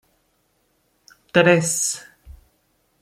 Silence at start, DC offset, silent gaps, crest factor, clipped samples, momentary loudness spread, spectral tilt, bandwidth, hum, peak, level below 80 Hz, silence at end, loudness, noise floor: 1.35 s; under 0.1%; none; 22 dB; under 0.1%; 9 LU; -3.5 dB/octave; 16 kHz; none; -2 dBFS; -54 dBFS; 0.7 s; -18 LUFS; -66 dBFS